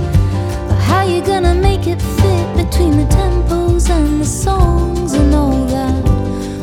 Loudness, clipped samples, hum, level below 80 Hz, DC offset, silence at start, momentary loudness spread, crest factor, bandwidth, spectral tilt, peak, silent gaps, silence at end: -14 LUFS; under 0.1%; none; -16 dBFS; under 0.1%; 0 s; 4 LU; 12 dB; 15.5 kHz; -6.5 dB/octave; 0 dBFS; none; 0 s